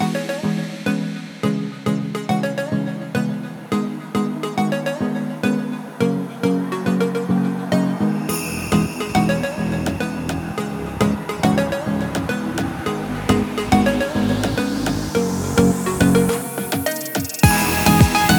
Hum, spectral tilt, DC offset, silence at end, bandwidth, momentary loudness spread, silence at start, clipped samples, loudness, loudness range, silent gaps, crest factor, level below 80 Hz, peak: none; -5.5 dB/octave; under 0.1%; 0 s; over 20 kHz; 8 LU; 0 s; under 0.1%; -20 LUFS; 5 LU; none; 20 dB; -38 dBFS; 0 dBFS